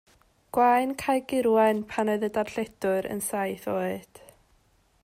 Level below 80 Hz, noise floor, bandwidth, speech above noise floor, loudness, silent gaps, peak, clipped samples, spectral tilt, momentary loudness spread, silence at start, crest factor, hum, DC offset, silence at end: -62 dBFS; -65 dBFS; 16 kHz; 39 dB; -26 LUFS; none; -10 dBFS; under 0.1%; -5 dB/octave; 9 LU; 0.55 s; 16 dB; none; under 0.1%; 1.05 s